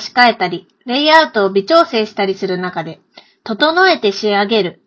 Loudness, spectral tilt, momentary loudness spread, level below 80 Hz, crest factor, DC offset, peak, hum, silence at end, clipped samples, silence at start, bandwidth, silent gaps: -13 LUFS; -4.5 dB/octave; 15 LU; -60 dBFS; 14 dB; under 0.1%; 0 dBFS; none; 0.15 s; 0.2%; 0 s; 8 kHz; none